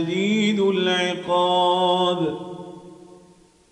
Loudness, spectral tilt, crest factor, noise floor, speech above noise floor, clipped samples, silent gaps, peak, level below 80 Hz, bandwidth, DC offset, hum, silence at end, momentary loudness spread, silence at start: -20 LUFS; -5 dB/octave; 14 dB; -53 dBFS; 33 dB; under 0.1%; none; -8 dBFS; -66 dBFS; 11 kHz; under 0.1%; none; 0.75 s; 16 LU; 0 s